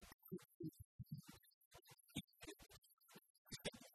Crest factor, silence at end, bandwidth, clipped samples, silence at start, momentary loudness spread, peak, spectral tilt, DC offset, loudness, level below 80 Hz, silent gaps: 24 dB; 0 s; 13.5 kHz; under 0.1%; 0 s; 16 LU; -34 dBFS; -4 dB/octave; under 0.1%; -57 LUFS; -76 dBFS; 0.14-0.19 s, 0.54-0.60 s, 0.85-0.99 s, 1.54-1.71 s, 2.24-2.28 s, 2.93-2.97 s, 3.30-3.45 s